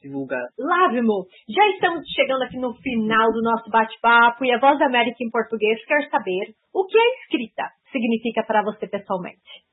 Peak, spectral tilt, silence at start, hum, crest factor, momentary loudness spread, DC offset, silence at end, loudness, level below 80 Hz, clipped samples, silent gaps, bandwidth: -6 dBFS; -9.5 dB/octave; 0.05 s; none; 16 dB; 11 LU; under 0.1%; 0.15 s; -20 LUFS; -62 dBFS; under 0.1%; none; 4.1 kHz